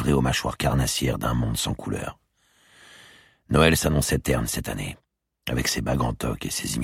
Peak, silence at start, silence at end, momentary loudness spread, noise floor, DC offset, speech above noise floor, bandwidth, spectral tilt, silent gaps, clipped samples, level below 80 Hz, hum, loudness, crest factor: -4 dBFS; 0 s; 0 s; 13 LU; -62 dBFS; under 0.1%; 38 dB; 16.5 kHz; -4.5 dB/octave; none; under 0.1%; -36 dBFS; none; -24 LUFS; 22 dB